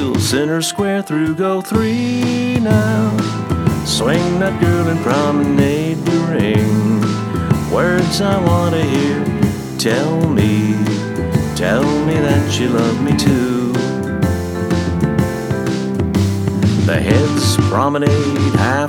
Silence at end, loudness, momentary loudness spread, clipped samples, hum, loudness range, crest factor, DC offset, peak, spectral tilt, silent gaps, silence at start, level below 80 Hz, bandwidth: 0 s; -16 LUFS; 4 LU; under 0.1%; none; 1 LU; 14 dB; under 0.1%; 0 dBFS; -6 dB/octave; none; 0 s; -36 dBFS; 19 kHz